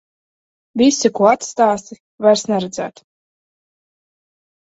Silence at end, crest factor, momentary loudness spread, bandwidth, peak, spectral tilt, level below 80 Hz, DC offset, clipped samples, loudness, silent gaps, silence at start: 1.8 s; 18 dB; 13 LU; 8.2 kHz; 0 dBFS; -4 dB/octave; -60 dBFS; under 0.1%; under 0.1%; -16 LUFS; 2.00-2.18 s; 0.75 s